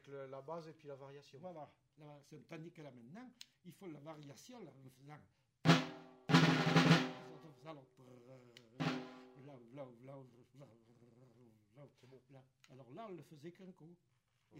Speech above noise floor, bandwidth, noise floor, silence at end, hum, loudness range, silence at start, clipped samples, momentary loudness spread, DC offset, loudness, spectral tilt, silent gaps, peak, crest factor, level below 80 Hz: 12 dB; 15.5 kHz; -68 dBFS; 0 s; none; 24 LU; 0.1 s; under 0.1%; 28 LU; under 0.1%; -35 LUFS; -5.5 dB/octave; none; -16 dBFS; 26 dB; -80 dBFS